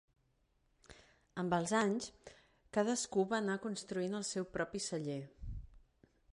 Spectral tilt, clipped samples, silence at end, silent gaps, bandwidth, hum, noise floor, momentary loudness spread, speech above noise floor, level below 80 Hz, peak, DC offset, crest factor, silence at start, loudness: -4.5 dB/octave; under 0.1%; 0.55 s; none; 11.5 kHz; none; -77 dBFS; 16 LU; 39 dB; -60 dBFS; -20 dBFS; under 0.1%; 20 dB; 0.9 s; -38 LUFS